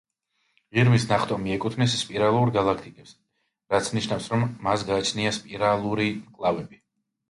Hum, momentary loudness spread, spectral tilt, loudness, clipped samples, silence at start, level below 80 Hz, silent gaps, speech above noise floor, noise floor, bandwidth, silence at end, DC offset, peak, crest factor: none; 7 LU; -5.5 dB/octave; -24 LUFS; under 0.1%; 0.75 s; -54 dBFS; none; 49 dB; -73 dBFS; 11.5 kHz; 0.55 s; under 0.1%; -8 dBFS; 18 dB